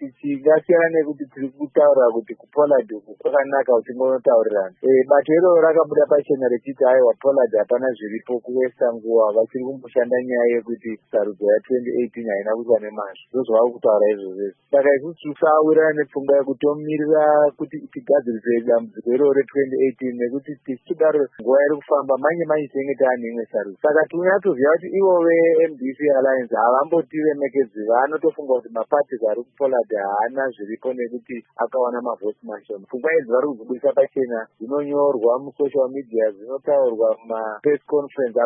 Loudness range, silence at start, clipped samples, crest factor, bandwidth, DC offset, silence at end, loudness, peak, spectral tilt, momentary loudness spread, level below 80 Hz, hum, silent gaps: 5 LU; 0 s; under 0.1%; 16 dB; 3.5 kHz; under 0.1%; 0 s; -19 LUFS; -2 dBFS; -11.5 dB/octave; 11 LU; -78 dBFS; none; none